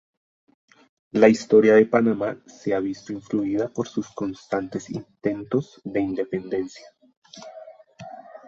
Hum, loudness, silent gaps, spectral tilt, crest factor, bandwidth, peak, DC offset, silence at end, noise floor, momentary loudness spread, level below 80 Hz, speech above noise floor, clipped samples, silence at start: none; -23 LUFS; 7.17-7.22 s; -6.5 dB/octave; 22 dB; 7.6 kHz; -2 dBFS; under 0.1%; 0.1 s; -45 dBFS; 24 LU; -62 dBFS; 22 dB; under 0.1%; 1.15 s